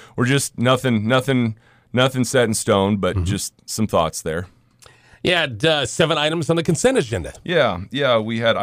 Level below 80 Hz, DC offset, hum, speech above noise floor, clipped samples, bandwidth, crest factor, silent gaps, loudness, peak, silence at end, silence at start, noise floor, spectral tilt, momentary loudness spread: -48 dBFS; under 0.1%; none; 32 dB; under 0.1%; 16 kHz; 14 dB; none; -19 LUFS; -6 dBFS; 0 s; 0 s; -51 dBFS; -4.5 dB/octave; 8 LU